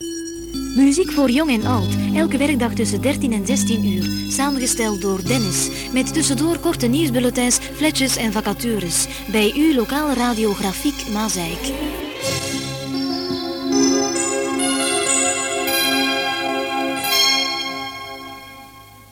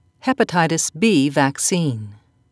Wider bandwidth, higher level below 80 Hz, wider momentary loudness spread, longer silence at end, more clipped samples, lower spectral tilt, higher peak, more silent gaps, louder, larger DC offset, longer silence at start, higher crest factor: first, 17 kHz vs 11 kHz; first, -40 dBFS vs -64 dBFS; about the same, 8 LU vs 8 LU; second, 0.05 s vs 0.35 s; neither; about the same, -3.5 dB/octave vs -4 dB/octave; about the same, -4 dBFS vs -2 dBFS; neither; about the same, -19 LUFS vs -18 LUFS; neither; second, 0 s vs 0.25 s; about the same, 16 dB vs 18 dB